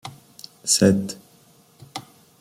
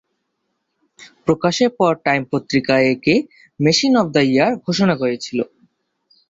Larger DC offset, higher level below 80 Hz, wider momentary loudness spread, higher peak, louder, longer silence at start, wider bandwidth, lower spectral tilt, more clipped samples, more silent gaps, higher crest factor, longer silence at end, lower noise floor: neither; about the same, -60 dBFS vs -56 dBFS; first, 24 LU vs 9 LU; about the same, -2 dBFS vs -2 dBFS; second, -20 LUFS vs -17 LUFS; second, 0.05 s vs 1 s; first, 16 kHz vs 8 kHz; about the same, -4 dB/octave vs -5 dB/octave; neither; neither; first, 22 dB vs 16 dB; second, 0.4 s vs 0.85 s; second, -55 dBFS vs -73 dBFS